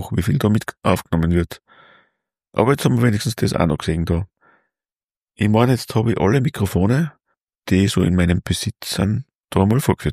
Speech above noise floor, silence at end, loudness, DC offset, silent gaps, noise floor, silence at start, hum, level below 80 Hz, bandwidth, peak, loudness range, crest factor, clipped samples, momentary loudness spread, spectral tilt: over 72 dB; 0 s; -19 LUFS; under 0.1%; 5.17-5.25 s, 7.58-7.62 s, 9.35-9.39 s; under -90 dBFS; 0 s; none; -38 dBFS; 15.5 kHz; -2 dBFS; 2 LU; 18 dB; under 0.1%; 7 LU; -6.5 dB/octave